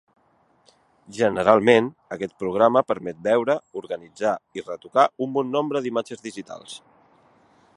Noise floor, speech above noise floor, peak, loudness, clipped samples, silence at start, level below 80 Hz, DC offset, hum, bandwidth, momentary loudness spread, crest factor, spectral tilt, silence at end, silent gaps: -63 dBFS; 40 dB; 0 dBFS; -22 LUFS; under 0.1%; 1.1 s; -64 dBFS; under 0.1%; none; 11.5 kHz; 18 LU; 24 dB; -5.5 dB/octave; 1 s; none